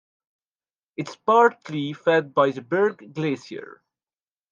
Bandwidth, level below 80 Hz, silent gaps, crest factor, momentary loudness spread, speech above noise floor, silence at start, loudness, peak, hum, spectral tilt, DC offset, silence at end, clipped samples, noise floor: 7.4 kHz; -78 dBFS; none; 18 dB; 17 LU; over 68 dB; 1 s; -22 LUFS; -6 dBFS; none; -6.5 dB/octave; under 0.1%; 0.8 s; under 0.1%; under -90 dBFS